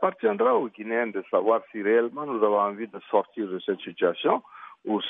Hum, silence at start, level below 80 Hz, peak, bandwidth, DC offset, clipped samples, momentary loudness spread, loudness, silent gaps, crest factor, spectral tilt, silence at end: none; 0 s; -82 dBFS; -8 dBFS; 3.8 kHz; under 0.1%; under 0.1%; 8 LU; -26 LUFS; none; 18 dB; -8.5 dB/octave; 0 s